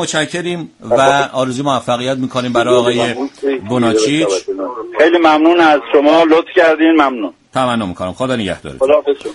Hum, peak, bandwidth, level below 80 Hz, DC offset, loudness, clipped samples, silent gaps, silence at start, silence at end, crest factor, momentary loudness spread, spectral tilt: none; 0 dBFS; 11.5 kHz; -50 dBFS; under 0.1%; -13 LUFS; under 0.1%; none; 0 s; 0 s; 12 dB; 11 LU; -4.5 dB/octave